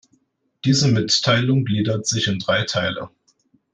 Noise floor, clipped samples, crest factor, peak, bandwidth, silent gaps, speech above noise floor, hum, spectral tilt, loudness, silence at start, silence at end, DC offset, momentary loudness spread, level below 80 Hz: -64 dBFS; under 0.1%; 16 dB; -6 dBFS; 10 kHz; none; 45 dB; none; -4.5 dB/octave; -19 LUFS; 0.65 s; 0.65 s; under 0.1%; 9 LU; -58 dBFS